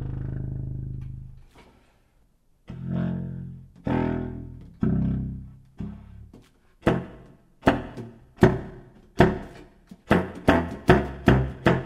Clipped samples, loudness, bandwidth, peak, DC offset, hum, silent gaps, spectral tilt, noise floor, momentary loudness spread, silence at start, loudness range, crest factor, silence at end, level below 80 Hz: under 0.1%; -25 LUFS; 13.5 kHz; 0 dBFS; under 0.1%; none; none; -8 dB/octave; -62 dBFS; 21 LU; 0 s; 11 LU; 26 dB; 0 s; -38 dBFS